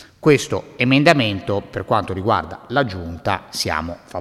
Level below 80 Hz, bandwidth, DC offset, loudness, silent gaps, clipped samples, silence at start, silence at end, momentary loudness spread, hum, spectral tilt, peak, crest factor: -46 dBFS; 15 kHz; under 0.1%; -19 LUFS; none; under 0.1%; 0 s; 0 s; 11 LU; none; -5 dB/octave; 0 dBFS; 20 dB